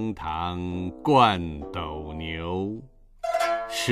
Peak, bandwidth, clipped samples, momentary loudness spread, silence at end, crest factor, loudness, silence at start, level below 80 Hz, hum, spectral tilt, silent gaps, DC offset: -6 dBFS; 15.5 kHz; under 0.1%; 15 LU; 0 s; 20 dB; -26 LUFS; 0 s; -46 dBFS; none; -5 dB/octave; none; under 0.1%